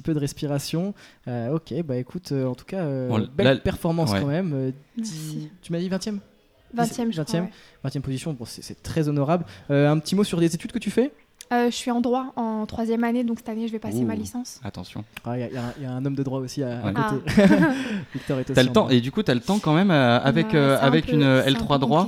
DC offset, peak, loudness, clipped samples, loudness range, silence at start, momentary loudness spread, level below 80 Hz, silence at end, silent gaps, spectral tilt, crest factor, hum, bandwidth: under 0.1%; -2 dBFS; -23 LUFS; under 0.1%; 9 LU; 0.05 s; 14 LU; -50 dBFS; 0 s; none; -6 dB/octave; 20 dB; none; 15.5 kHz